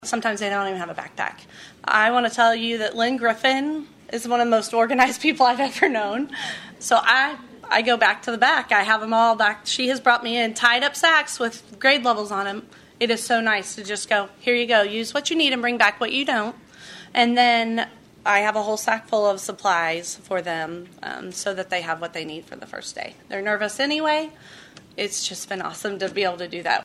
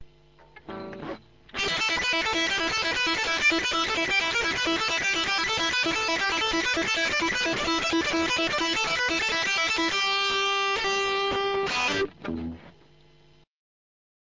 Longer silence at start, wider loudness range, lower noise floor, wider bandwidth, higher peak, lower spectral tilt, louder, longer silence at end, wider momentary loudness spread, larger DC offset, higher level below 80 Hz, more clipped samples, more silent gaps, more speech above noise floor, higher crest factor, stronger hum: about the same, 0 s vs 0 s; first, 7 LU vs 3 LU; second, -43 dBFS vs -59 dBFS; first, 14 kHz vs 7.6 kHz; first, -2 dBFS vs -12 dBFS; about the same, -2 dB/octave vs -1.5 dB/octave; first, -21 LUFS vs -24 LUFS; second, 0 s vs 1.65 s; first, 14 LU vs 11 LU; neither; second, -66 dBFS vs -52 dBFS; neither; neither; second, 21 dB vs 33 dB; first, 20 dB vs 14 dB; neither